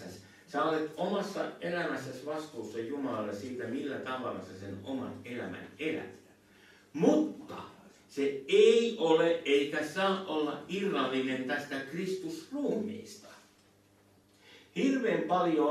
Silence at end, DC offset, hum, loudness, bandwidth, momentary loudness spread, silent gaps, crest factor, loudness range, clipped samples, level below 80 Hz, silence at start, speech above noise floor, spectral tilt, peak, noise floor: 0 s; under 0.1%; none; -32 LUFS; 13.5 kHz; 16 LU; none; 20 dB; 10 LU; under 0.1%; -78 dBFS; 0 s; 33 dB; -5 dB/octave; -12 dBFS; -64 dBFS